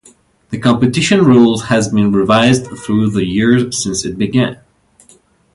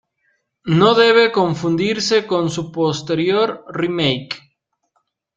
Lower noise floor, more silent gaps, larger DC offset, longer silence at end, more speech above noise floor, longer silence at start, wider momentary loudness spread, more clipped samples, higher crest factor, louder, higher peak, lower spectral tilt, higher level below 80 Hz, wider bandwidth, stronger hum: second, -49 dBFS vs -69 dBFS; neither; neither; about the same, 1 s vs 1 s; second, 37 dB vs 52 dB; second, 0.5 s vs 0.65 s; second, 8 LU vs 12 LU; neither; about the same, 14 dB vs 16 dB; first, -13 LUFS vs -17 LUFS; about the same, 0 dBFS vs -2 dBFS; about the same, -5.5 dB/octave vs -5 dB/octave; first, -44 dBFS vs -56 dBFS; first, 11.5 kHz vs 8.8 kHz; neither